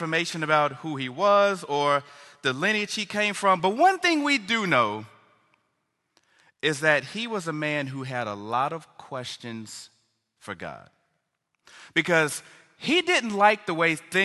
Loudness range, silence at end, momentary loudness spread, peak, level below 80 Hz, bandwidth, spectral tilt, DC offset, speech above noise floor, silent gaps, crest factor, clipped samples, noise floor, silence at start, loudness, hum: 10 LU; 0 s; 16 LU; -4 dBFS; -72 dBFS; 12.5 kHz; -4 dB/octave; under 0.1%; 52 dB; none; 22 dB; under 0.1%; -77 dBFS; 0 s; -24 LUFS; none